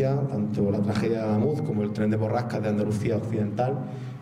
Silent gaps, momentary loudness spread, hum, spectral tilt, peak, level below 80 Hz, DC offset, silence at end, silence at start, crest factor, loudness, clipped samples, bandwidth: none; 3 LU; none; -8.5 dB/octave; -14 dBFS; -58 dBFS; under 0.1%; 0 s; 0 s; 12 dB; -26 LUFS; under 0.1%; 11.5 kHz